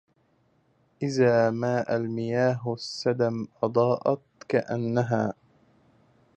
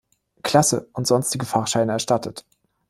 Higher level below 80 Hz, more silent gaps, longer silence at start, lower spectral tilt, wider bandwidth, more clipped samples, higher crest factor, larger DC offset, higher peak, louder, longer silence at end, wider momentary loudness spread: second, -68 dBFS vs -58 dBFS; neither; first, 1 s vs 0.45 s; first, -7 dB/octave vs -4 dB/octave; second, 9 kHz vs 16 kHz; neither; about the same, 18 dB vs 20 dB; neither; second, -10 dBFS vs -2 dBFS; second, -26 LUFS vs -21 LUFS; first, 1.05 s vs 0.5 s; about the same, 9 LU vs 11 LU